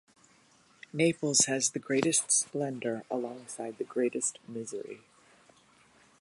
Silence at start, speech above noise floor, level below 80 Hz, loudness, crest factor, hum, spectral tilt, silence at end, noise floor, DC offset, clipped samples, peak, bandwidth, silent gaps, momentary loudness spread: 0.95 s; 32 dB; -78 dBFS; -29 LUFS; 22 dB; none; -3 dB/octave; 1.25 s; -63 dBFS; under 0.1%; under 0.1%; -10 dBFS; 11.5 kHz; none; 16 LU